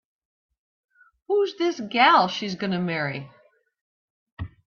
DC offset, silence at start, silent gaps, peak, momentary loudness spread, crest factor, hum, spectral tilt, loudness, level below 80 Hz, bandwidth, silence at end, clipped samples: under 0.1%; 1.3 s; 3.81-4.26 s, 4.32-4.37 s; -4 dBFS; 18 LU; 22 dB; none; -5.5 dB/octave; -22 LUFS; -60 dBFS; 7 kHz; 0.2 s; under 0.1%